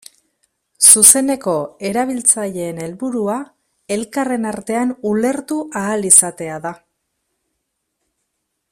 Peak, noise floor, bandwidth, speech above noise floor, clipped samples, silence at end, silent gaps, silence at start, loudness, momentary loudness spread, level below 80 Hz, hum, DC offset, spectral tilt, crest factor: 0 dBFS; -73 dBFS; 16 kHz; 57 dB; 0.2%; 1.95 s; none; 0.8 s; -14 LUFS; 17 LU; -60 dBFS; none; under 0.1%; -2.5 dB/octave; 18 dB